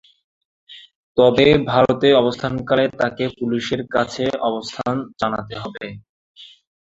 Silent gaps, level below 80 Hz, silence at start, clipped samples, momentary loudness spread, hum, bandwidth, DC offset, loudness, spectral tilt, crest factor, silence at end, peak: 0.95-1.15 s, 6.09-6.35 s; -48 dBFS; 0.7 s; under 0.1%; 13 LU; none; 7.8 kHz; under 0.1%; -19 LUFS; -6 dB/octave; 18 dB; 0.35 s; -2 dBFS